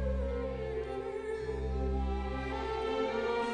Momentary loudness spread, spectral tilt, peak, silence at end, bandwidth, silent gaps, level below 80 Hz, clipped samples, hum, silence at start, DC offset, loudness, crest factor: 5 LU; -7 dB/octave; -22 dBFS; 0 s; 9.6 kHz; none; -40 dBFS; under 0.1%; none; 0 s; under 0.1%; -36 LUFS; 12 dB